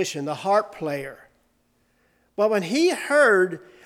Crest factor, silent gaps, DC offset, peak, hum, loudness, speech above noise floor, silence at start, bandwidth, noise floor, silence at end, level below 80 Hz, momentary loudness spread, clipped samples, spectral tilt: 16 dB; none; under 0.1%; -6 dBFS; none; -22 LUFS; 44 dB; 0 s; 16 kHz; -66 dBFS; 0.25 s; -68 dBFS; 14 LU; under 0.1%; -4 dB/octave